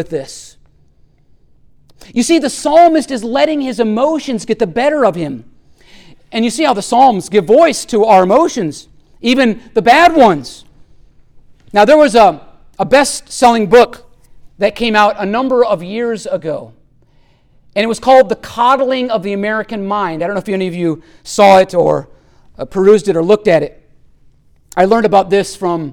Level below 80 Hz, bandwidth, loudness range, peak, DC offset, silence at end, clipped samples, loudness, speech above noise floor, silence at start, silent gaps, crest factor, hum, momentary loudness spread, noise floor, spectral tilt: -44 dBFS; 17 kHz; 5 LU; 0 dBFS; under 0.1%; 0 s; under 0.1%; -12 LUFS; 38 dB; 0 s; none; 12 dB; none; 14 LU; -49 dBFS; -4.5 dB/octave